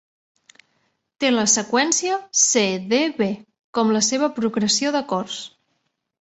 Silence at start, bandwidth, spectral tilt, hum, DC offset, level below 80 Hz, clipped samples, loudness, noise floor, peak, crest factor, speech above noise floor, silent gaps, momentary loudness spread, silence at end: 1.2 s; 8.4 kHz; -2.5 dB/octave; none; under 0.1%; -66 dBFS; under 0.1%; -20 LUFS; -73 dBFS; -4 dBFS; 18 dB; 52 dB; 3.64-3.73 s; 11 LU; 0.75 s